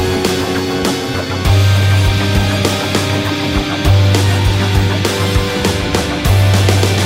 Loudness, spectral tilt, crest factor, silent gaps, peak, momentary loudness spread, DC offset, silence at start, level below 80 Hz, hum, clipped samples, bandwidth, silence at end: -13 LUFS; -5 dB/octave; 12 dB; none; 0 dBFS; 5 LU; 0.2%; 0 s; -24 dBFS; none; under 0.1%; 16.5 kHz; 0 s